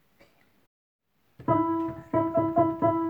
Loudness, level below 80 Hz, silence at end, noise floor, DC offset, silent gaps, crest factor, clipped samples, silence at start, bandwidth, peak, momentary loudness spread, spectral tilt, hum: -27 LUFS; -60 dBFS; 0 s; -62 dBFS; under 0.1%; none; 18 dB; under 0.1%; 1.4 s; 3.7 kHz; -10 dBFS; 6 LU; -10.5 dB/octave; none